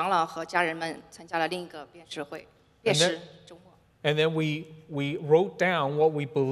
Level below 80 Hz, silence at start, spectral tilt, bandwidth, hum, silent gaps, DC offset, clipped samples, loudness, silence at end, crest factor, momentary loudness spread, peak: -70 dBFS; 0 s; -4.5 dB/octave; 13 kHz; none; none; under 0.1%; under 0.1%; -27 LUFS; 0 s; 20 dB; 16 LU; -8 dBFS